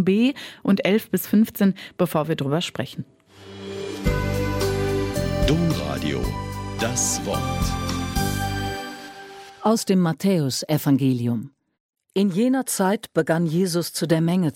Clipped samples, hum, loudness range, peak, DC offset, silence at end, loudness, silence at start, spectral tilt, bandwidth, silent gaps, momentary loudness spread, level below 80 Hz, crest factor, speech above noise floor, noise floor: under 0.1%; none; 3 LU; -6 dBFS; under 0.1%; 0.05 s; -23 LUFS; 0 s; -5.5 dB/octave; 17 kHz; 11.80-11.89 s; 12 LU; -38 dBFS; 16 dB; 20 dB; -42 dBFS